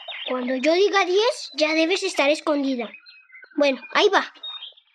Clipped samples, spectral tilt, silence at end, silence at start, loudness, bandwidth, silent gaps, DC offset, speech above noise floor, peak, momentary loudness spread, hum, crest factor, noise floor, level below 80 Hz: under 0.1%; -1.5 dB/octave; 0.25 s; 0 s; -21 LUFS; 11.5 kHz; none; under 0.1%; 27 dB; -4 dBFS; 14 LU; none; 20 dB; -48 dBFS; -84 dBFS